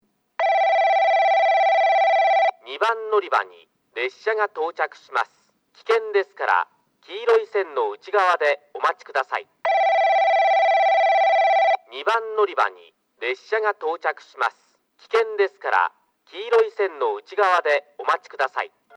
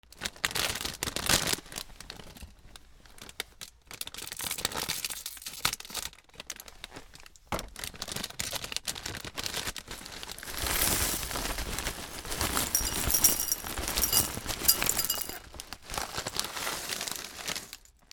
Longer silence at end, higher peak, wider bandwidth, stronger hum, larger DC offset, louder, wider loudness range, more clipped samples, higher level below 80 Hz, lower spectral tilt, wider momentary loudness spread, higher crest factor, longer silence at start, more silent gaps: about the same, 0.3 s vs 0.3 s; about the same, -6 dBFS vs -6 dBFS; second, 9.8 kHz vs over 20 kHz; neither; neither; first, -21 LUFS vs -30 LUFS; second, 6 LU vs 11 LU; neither; second, -86 dBFS vs -46 dBFS; about the same, -1 dB/octave vs -1 dB/octave; second, 10 LU vs 19 LU; second, 16 dB vs 28 dB; first, 0.4 s vs 0.1 s; neither